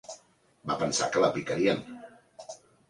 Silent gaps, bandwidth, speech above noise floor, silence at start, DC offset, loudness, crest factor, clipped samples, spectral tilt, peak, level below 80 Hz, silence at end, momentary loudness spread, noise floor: none; 11.5 kHz; 34 dB; 0.1 s; under 0.1%; -28 LUFS; 22 dB; under 0.1%; -4 dB/octave; -10 dBFS; -64 dBFS; 0.35 s; 21 LU; -61 dBFS